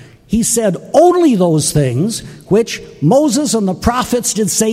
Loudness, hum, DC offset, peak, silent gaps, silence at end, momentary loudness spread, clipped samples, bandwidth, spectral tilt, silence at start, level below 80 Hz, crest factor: -13 LUFS; none; under 0.1%; 0 dBFS; none; 0 s; 7 LU; under 0.1%; 16 kHz; -5 dB/octave; 0 s; -36 dBFS; 12 dB